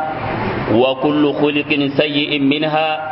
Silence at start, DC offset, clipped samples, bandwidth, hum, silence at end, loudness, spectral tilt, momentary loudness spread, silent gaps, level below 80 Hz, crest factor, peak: 0 s; under 0.1%; under 0.1%; 5.8 kHz; none; 0 s; -16 LUFS; -11 dB/octave; 5 LU; none; -44 dBFS; 16 dB; 0 dBFS